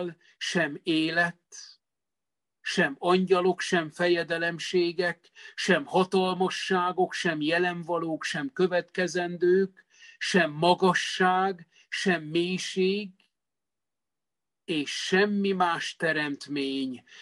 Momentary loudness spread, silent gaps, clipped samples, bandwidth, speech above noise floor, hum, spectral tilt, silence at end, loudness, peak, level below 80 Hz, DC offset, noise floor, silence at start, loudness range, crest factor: 9 LU; none; under 0.1%; 11.5 kHz; over 63 dB; none; -4.5 dB/octave; 0 s; -27 LUFS; -8 dBFS; -74 dBFS; under 0.1%; under -90 dBFS; 0 s; 4 LU; 20 dB